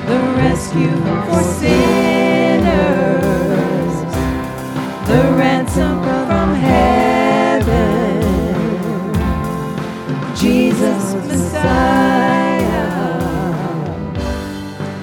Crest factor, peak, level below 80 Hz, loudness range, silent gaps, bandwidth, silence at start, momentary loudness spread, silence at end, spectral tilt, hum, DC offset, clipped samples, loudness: 14 dB; 0 dBFS; -30 dBFS; 3 LU; none; 18 kHz; 0 s; 10 LU; 0 s; -6.5 dB/octave; none; under 0.1%; under 0.1%; -15 LUFS